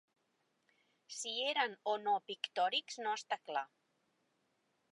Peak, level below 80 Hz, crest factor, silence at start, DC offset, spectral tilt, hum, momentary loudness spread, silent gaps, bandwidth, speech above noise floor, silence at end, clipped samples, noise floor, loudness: -20 dBFS; under -90 dBFS; 22 dB; 1.1 s; under 0.1%; -0.5 dB/octave; none; 8 LU; none; 11 kHz; 42 dB; 1.25 s; under 0.1%; -81 dBFS; -38 LUFS